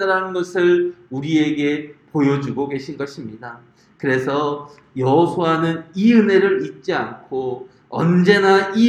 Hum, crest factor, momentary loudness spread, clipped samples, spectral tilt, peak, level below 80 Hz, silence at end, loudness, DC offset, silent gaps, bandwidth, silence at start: none; 18 dB; 15 LU; under 0.1%; -7 dB/octave; 0 dBFS; -62 dBFS; 0 s; -18 LUFS; under 0.1%; none; 10.5 kHz; 0 s